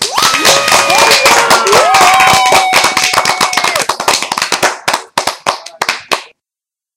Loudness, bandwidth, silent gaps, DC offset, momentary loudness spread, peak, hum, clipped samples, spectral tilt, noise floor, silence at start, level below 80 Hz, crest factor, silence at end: -9 LUFS; over 20 kHz; none; under 0.1%; 11 LU; 0 dBFS; none; 0.8%; -0.5 dB/octave; -87 dBFS; 0 s; -46 dBFS; 10 dB; 0.7 s